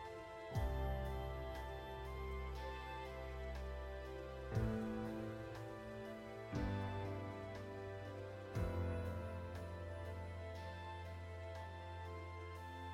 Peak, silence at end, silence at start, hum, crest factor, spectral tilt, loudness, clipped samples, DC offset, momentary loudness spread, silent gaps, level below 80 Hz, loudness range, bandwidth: -30 dBFS; 0 s; 0 s; none; 16 dB; -7 dB/octave; -47 LUFS; under 0.1%; under 0.1%; 8 LU; none; -52 dBFS; 3 LU; 16 kHz